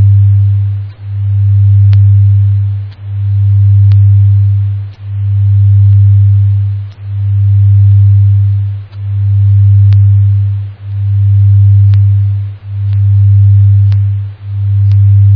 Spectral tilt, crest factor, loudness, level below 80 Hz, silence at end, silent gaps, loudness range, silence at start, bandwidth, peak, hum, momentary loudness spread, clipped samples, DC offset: -11 dB/octave; 6 dB; -8 LUFS; -40 dBFS; 0 s; none; 2 LU; 0 s; 0.8 kHz; 0 dBFS; none; 12 LU; under 0.1%; under 0.1%